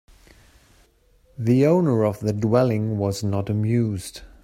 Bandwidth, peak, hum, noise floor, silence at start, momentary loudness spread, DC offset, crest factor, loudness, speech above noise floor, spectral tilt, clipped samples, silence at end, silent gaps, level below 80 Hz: 15 kHz; -6 dBFS; none; -58 dBFS; 1.4 s; 9 LU; under 0.1%; 16 dB; -22 LUFS; 38 dB; -7.5 dB/octave; under 0.1%; 0.2 s; none; -54 dBFS